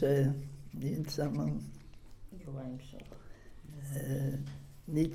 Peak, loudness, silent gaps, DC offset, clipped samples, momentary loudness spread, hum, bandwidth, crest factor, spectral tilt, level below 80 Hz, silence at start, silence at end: -20 dBFS; -37 LUFS; none; under 0.1%; under 0.1%; 21 LU; none; 15.5 kHz; 16 dB; -7.5 dB/octave; -54 dBFS; 0 s; 0 s